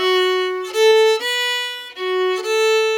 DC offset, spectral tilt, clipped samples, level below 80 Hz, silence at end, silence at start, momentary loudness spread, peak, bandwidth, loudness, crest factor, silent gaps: under 0.1%; 0 dB/octave; under 0.1%; -72 dBFS; 0 s; 0 s; 9 LU; -4 dBFS; 17.5 kHz; -17 LUFS; 12 dB; none